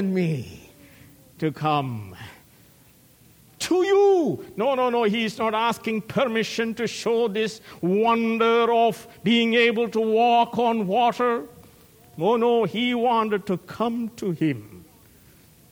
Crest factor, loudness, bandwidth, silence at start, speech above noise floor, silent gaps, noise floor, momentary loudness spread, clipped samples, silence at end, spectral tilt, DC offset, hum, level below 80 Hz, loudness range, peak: 16 dB; -22 LUFS; 17 kHz; 0 s; 32 dB; none; -54 dBFS; 11 LU; under 0.1%; 0.9 s; -5.5 dB/octave; under 0.1%; none; -64 dBFS; 5 LU; -6 dBFS